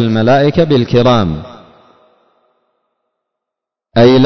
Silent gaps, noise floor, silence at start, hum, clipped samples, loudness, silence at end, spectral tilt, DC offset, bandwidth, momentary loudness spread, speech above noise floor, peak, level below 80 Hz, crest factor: none; -82 dBFS; 0 s; none; under 0.1%; -11 LUFS; 0 s; -7.5 dB/octave; under 0.1%; 6.4 kHz; 11 LU; 73 dB; 0 dBFS; -38 dBFS; 12 dB